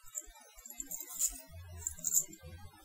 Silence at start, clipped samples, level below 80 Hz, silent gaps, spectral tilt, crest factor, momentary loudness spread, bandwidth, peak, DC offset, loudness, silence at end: 0.05 s; under 0.1%; -60 dBFS; none; -1 dB/octave; 26 dB; 21 LU; 17.5 kHz; -14 dBFS; under 0.1%; -36 LUFS; 0 s